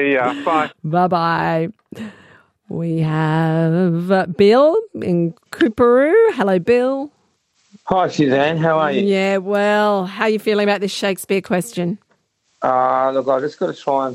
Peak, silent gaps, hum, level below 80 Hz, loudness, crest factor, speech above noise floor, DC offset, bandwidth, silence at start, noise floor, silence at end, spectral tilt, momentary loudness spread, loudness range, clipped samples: -2 dBFS; none; none; -58 dBFS; -17 LUFS; 16 dB; 47 dB; under 0.1%; 15 kHz; 0 s; -63 dBFS; 0 s; -6.5 dB/octave; 11 LU; 4 LU; under 0.1%